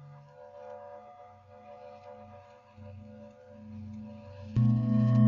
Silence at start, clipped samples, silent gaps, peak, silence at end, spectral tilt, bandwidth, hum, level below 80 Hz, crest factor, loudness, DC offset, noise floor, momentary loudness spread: 0.4 s; under 0.1%; none; -12 dBFS; 0 s; -10.5 dB/octave; 4.5 kHz; none; -60 dBFS; 20 dB; -29 LUFS; under 0.1%; -53 dBFS; 25 LU